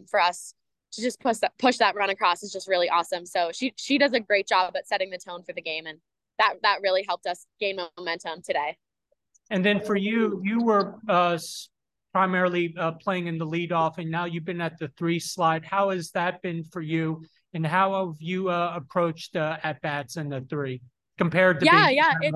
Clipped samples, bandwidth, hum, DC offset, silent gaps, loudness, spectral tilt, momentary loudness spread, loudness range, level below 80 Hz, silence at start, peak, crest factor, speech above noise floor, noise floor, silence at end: under 0.1%; 12.5 kHz; none; under 0.1%; none; -25 LUFS; -5 dB/octave; 11 LU; 4 LU; -72 dBFS; 0.15 s; -4 dBFS; 22 dB; 50 dB; -76 dBFS; 0 s